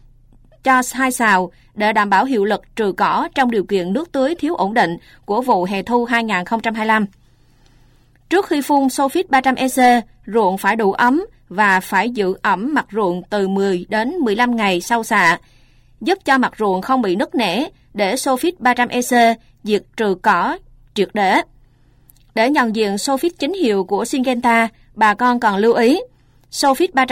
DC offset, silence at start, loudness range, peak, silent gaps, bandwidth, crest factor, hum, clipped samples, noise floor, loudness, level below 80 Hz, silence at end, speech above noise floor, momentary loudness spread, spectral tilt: under 0.1%; 0.65 s; 3 LU; -4 dBFS; none; 16.5 kHz; 14 dB; none; under 0.1%; -51 dBFS; -17 LUFS; -52 dBFS; 0 s; 35 dB; 7 LU; -4 dB/octave